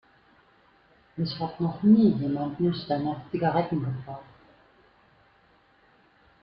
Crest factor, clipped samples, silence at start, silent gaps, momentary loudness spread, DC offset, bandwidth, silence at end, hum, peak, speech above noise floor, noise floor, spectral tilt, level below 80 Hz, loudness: 20 dB; under 0.1%; 1.15 s; none; 16 LU; under 0.1%; 5.6 kHz; 2.2 s; none; -10 dBFS; 36 dB; -61 dBFS; -11 dB/octave; -62 dBFS; -26 LUFS